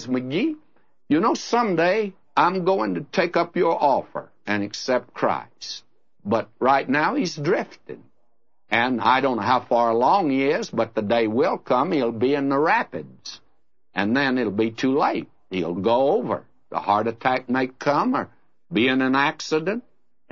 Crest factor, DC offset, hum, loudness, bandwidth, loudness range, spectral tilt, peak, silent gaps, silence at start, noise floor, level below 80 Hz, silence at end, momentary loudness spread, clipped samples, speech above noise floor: 18 dB; 0.2%; none; -22 LUFS; 7.4 kHz; 3 LU; -5.5 dB/octave; -4 dBFS; none; 0 s; -73 dBFS; -70 dBFS; 0.5 s; 12 LU; under 0.1%; 51 dB